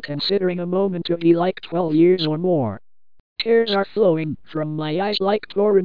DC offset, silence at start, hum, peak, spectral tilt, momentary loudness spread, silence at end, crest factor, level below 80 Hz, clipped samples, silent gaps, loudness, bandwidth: 0.8%; 0 s; none; -4 dBFS; -8.5 dB/octave; 10 LU; 0 s; 14 dB; -60 dBFS; under 0.1%; 3.20-3.36 s; -20 LUFS; 5.2 kHz